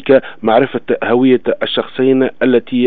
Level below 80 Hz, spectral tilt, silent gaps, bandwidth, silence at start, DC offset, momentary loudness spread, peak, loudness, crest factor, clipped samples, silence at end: -58 dBFS; -9.5 dB/octave; none; 4.4 kHz; 0.05 s; 2%; 5 LU; 0 dBFS; -13 LUFS; 12 dB; under 0.1%; 0 s